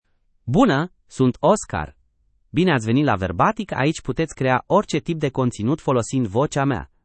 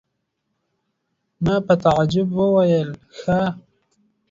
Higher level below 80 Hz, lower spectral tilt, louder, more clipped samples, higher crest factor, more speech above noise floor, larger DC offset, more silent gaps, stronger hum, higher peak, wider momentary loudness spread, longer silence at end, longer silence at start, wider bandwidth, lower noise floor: about the same, -46 dBFS vs -48 dBFS; second, -6 dB/octave vs -7.5 dB/octave; about the same, -21 LUFS vs -19 LUFS; neither; about the same, 18 dB vs 18 dB; second, 43 dB vs 56 dB; neither; neither; neither; about the same, -2 dBFS vs -4 dBFS; second, 7 LU vs 12 LU; second, 0.2 s vs 0.7 s; second, 0.45 s vs 1.4 s; first, 8.8 kHz vs 7.6 kHz; second, -63 dBFS vs -75 dBFS